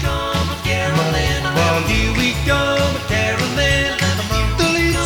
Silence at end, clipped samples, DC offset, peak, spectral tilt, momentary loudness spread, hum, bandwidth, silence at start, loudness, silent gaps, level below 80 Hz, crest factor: 0 s; under 0.1%; under 0.1%; -2 dBFS; -4.5 dB/octave; 4 LU; none; 19.5 kHz; 0 s; -17 LUFS; none; -26 dBFS; 14 dB